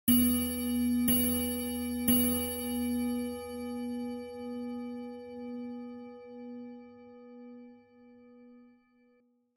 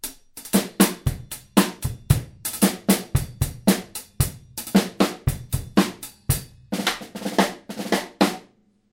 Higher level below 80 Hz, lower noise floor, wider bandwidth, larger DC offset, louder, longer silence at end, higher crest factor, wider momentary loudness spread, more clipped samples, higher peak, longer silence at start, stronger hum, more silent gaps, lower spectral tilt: second, -56 dBFS vs -38 dBFS; first, -69 dBFS vs -57 dBFS; about the same, 16.5 kHz vs 17 kHz; neither; second, -31 LUFS vs -23 LUFS; first, 0.9 s vs 0.5 s; about the same, 20 dB vs 24 dB; first, 24 LU vs 12 LU; neither; second, -14 dBFS vs 0 dBFS; about the same, 0.05 s vs 0.05 s; neither; neither; about the same, -3.5 dB/octave vs -4.5 dB/octave